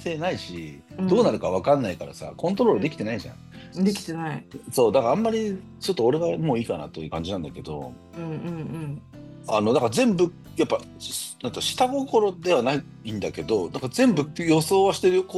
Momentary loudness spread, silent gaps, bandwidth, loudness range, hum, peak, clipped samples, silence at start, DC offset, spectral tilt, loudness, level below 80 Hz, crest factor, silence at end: 15 LU; none; 13 kHz; 4 LU; none; -8 dBFS; under 0.1%; 0 s; under 0.1%; -5.5 dB/octave; -24 LUFS; -58 dBFS; 16 dB; 0 s